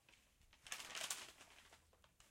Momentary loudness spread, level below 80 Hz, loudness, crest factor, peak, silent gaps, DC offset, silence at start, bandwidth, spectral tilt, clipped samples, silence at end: 20 LU; -80 dBFS; -49 LUFS; 34 dB; -22 dBFS; none; under 0.1%; 0.1 s; 16.5 kHz; 1 dB/octave; under 0.1%; 0 s